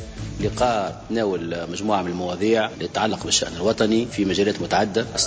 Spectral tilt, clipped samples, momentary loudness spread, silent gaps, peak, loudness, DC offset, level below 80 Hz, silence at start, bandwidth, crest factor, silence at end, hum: -4 dB/octave; under 0.1%; 7 LU; none; -6 dBFS; -22 LUFS; under 0.1%; -44 dBFS; 0 s; 8 kHz; 16 dB; 0 s; none